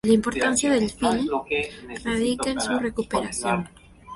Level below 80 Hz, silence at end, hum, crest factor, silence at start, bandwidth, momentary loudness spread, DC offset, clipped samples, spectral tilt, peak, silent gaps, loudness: -48 dBFS; 0 s; none; 18 dB; 0.05 s; 11.5 kHz; 7 LU; under 0.1%; under 0.1%; -4 dB/octave; -6 dBFS; none; -24 LUFS